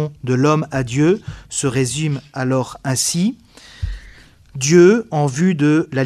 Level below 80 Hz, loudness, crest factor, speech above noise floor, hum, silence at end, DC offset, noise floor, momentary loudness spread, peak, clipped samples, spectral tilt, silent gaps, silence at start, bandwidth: -40 dBFS; -17 LUFS; 18 dB; 27 dB; none; 0 s; under 0.1%; -43 dBFS; 17 LU; 0 dBFS; under 0.1%; -5.5 dB/octave; none; 0 s; 14.5 kHz